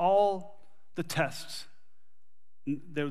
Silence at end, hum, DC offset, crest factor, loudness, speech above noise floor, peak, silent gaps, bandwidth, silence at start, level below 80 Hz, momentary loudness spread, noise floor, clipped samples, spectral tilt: 0 s; none; 0.9%; 18 dB; -33 LUFS; 57 dB; -14 dBFS; none; 15 kHz; 0 s; -72 dBFS; 17 LU; -87 dBFS; under 0.1%; -5 dB/octave